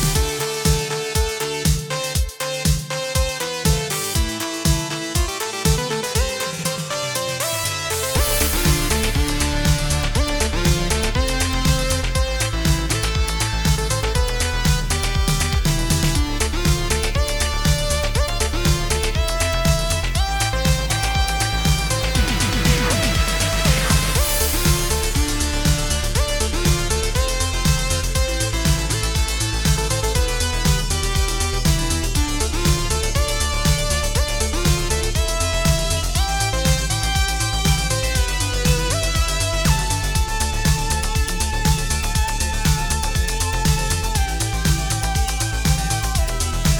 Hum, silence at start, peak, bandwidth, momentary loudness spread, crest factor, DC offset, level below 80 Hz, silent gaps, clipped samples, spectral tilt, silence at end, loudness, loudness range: none; 0 s; -2 dBFS; 19 kHz; 3 LU; 16 dB; 0.2%; -22 dBFS; none; under 0.1%; -3.5 dB/octave; 0 s; -20 LUFS; 2 LU